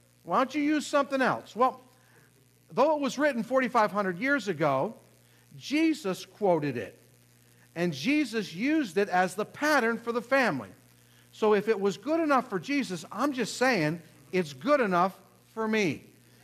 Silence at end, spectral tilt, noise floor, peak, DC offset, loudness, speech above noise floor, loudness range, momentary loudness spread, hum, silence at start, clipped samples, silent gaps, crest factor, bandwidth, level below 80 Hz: 0.45 s; -5 dB/octave; -61 dBFS; -12 dBFS; under 0.1%; -28 LUFS; 34 dB; 3 LU; 9 LU; 60 Hz at -65 dBFS; 0.25 s; under 0.1%; none; 18 dB; 14.5 kHz; -76 dBFS